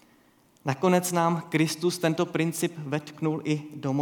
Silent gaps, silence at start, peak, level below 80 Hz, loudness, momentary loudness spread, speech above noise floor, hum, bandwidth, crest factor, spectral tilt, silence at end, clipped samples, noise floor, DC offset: none; 0.65 s; -8 dBFS; -76 dBFS; -27 LUFS; 9 LU; 35 dB; none; 19 kHz; 18 dB; -5.5 dB/octave; 0 s; under 0.1%; -61 dBFS; under 0.1%